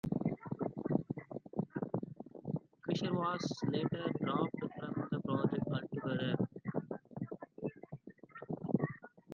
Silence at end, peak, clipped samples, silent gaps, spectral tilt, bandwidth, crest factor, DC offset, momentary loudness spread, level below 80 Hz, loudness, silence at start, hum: 0 s; -16 dBFS; under 0.1%; none; -7.5 dB/octave; 7.4 kHz; 22 dB; under 0.1%; 11 LU; -70 dBFS; -39 LUFS; 0.05 s; none